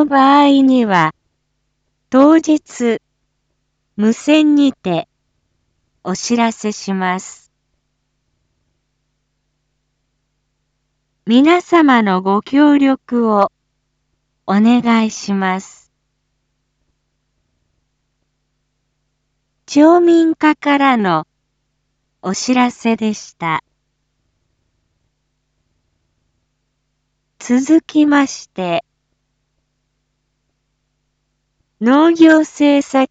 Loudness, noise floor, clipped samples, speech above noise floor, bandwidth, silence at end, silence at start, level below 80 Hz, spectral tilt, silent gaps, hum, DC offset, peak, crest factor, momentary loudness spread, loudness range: -13 LUFS; -69 dBFS; under 0.1%; 56 dB; 8 kHz; 0.05 s; 0 s; -62 dBFS; -5 dB/octave; none; none; under 0.1%; 0 dBFS; 16 dB; 13 LU; 12 LU